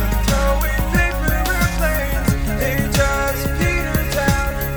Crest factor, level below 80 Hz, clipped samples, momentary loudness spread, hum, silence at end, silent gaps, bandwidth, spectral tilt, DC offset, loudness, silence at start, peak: 16 dB; -22 dBFS; under 0.1%; 2 LU; none; 0 s; none; over 20 kHz; -5 dB/octave; under 0.1%; -19 LUFS; 0 s; -2 dBFS